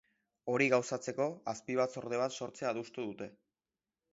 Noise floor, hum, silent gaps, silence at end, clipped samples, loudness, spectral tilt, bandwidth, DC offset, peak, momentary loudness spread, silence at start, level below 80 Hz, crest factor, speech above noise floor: under -90 dBFS; none; none; 0.8 s; under 0.1%; -35 LUFS; -4 dB/octave; 7.6 kHz; under 0.1%; -16 dBFS; 13 LU; 0.45 s; -80 dBFS; 22 dB; over 55 dB